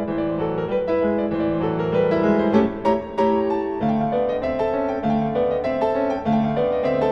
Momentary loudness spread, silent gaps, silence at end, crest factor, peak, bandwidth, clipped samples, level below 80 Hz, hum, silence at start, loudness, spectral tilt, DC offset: 4 LU; none; 0 s; 16 dB; -4 dBFS; 6.6 kHz; under 0.1%; -46 dBFS; none; 0 s; -21 LUFS; -8.5 dB/octave; under 0.1%